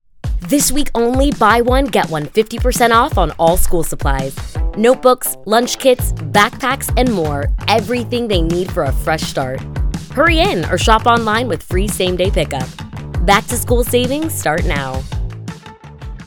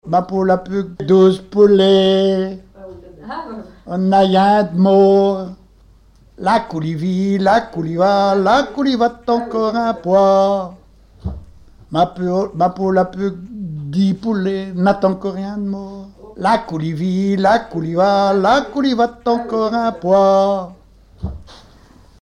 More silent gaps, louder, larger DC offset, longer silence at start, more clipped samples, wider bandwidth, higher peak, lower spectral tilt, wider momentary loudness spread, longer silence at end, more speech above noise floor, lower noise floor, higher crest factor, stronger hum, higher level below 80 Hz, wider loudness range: neither; about the same, -15 LUFS vs -16 LUFS; neither; first, 0.25 s vs 0.05 s; neither; first, 19.5 kHz vs 10 kHz; about the same, 0 dBFS vs -2 dBFS; second, -4.5 dB/octave vs -7 dB/octave; second, 12 LU vs 17 LU; second, 0 s vs 0.7 s; second, 21 dB vs 33 dB; second, -35 dBFS vs -48 dBFS; about the same, 14 dB vs 14 dB; neither; first, -22 dBFS vs -44 dBFS; about the same, 3 LU vs 4 LU